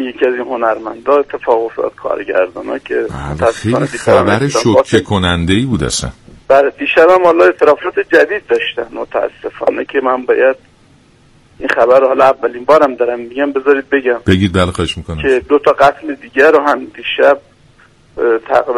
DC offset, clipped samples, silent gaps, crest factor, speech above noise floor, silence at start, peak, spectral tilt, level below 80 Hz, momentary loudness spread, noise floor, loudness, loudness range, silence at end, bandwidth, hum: under 0.1%; 0.4%; none; 12 dB; 35 dB; 0 s; 0 dBFS; -5.5 dB/octave; -40 dBFS; 10 LU; -47 dBFS; -12 LUFS; 5 LU; 0 s; 12 kHz; none